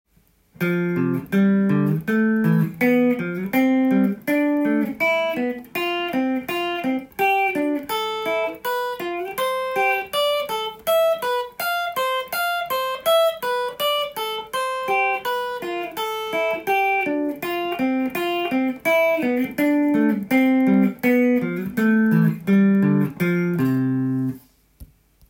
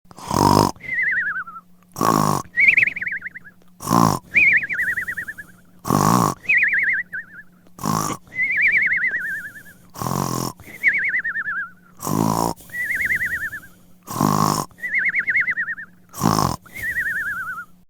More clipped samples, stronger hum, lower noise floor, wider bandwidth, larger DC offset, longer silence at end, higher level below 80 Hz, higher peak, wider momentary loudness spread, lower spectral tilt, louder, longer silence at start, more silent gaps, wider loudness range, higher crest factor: neither; neither; first, -60 dBFS vs -45 dBFS; second, 17 kHz vs over 20 kHz; neither; first, 0.45 s vs 0.25 s; second, -60 dBFS vs -50 dBFS; second, -6 dBFS vs 0 dBFS; second, 7 LU vs 15 LU; first, -6 dB/octave vs -4.5 dB/octave; about the same, -21 LUFS vs -19 LUFS; first, 0.6 s vs 0.15 s; neither; about the same, 4 LU vs 5 LU; second, 14 dB vs 22 dB